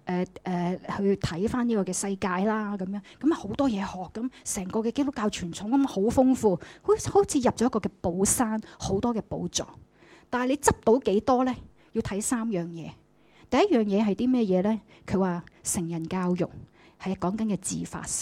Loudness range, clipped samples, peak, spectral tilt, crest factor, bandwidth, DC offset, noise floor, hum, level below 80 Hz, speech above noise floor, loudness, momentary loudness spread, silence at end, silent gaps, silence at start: 4 LU; under 0.1%; -6 dBFS; -5 dB/octave; 20 dB; 16 kHz; under 0.1%; -58 dBFS; none; -52 dBFS; 31 dB; -27 LUFS; 10 LU; 0 s; none; 0.05 s